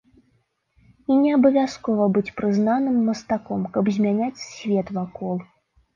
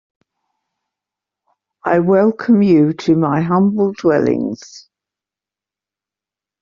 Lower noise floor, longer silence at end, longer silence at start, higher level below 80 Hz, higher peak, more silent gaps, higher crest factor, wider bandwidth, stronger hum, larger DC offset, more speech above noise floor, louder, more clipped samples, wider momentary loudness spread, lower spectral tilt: second, -67 dBFS vs -88 dBFS; second, 0.5 s vs 1.8 s; second, 1.1 s vs 1.85 s; about the same, -60 dBFS vs -56 dBFS; second, -6 dBFS vs -2 dBFS; neither; about the same, 16 dB vs 16 dB; about the same, 7.4 kHz vs 7.2 kHz; second, none vs 50 Hz at -35 dBFS; neither; second, 46 dB vs 74 dB; second, -22 LUFS vs -14 LUFS; neither; about the same, 11 LU vs 9 LU; about the same, -7.5 dB/octave vs -7.5 dB/octave